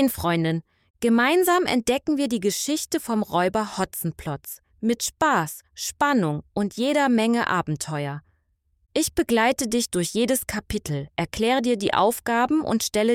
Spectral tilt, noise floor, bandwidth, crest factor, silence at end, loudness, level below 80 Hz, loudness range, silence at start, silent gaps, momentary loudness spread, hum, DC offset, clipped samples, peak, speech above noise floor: -4 dB/octave; -68 dBFS; 17 kHz; 18 dB; 0 s; -23 LUFS; -50 dBFS; 3 LU; 0 s; 0.90-0.94 s; 9 LU; none; under 0.1%; under 0.1%; -6 dBFS; 45 dB